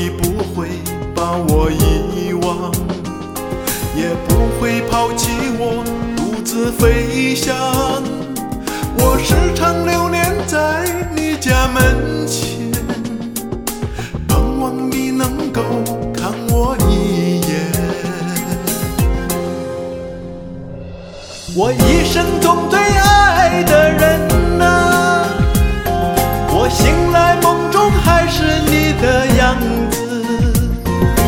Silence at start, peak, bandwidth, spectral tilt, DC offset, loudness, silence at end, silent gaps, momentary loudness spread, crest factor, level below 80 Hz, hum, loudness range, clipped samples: 0 s; 0 dBFS; 18 kHz; -5 dB/octave; under 0.1%; -15 LUFS; 0 s; none; 11 LU; 14 dB; -22 dBFS; none; 7 LU; under 0.1%